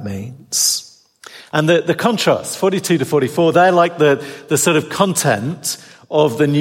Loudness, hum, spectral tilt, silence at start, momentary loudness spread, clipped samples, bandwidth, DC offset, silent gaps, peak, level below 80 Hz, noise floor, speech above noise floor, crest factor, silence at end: -16 LUFS; none; -4 dB/octave; 0 s; 9 LU; under 0.1%; 16.5 kHz; under 0.1%; none; -2 dBFS; -62 dBFS; -42 dBFS; 27 dB; 16 dB; 0 s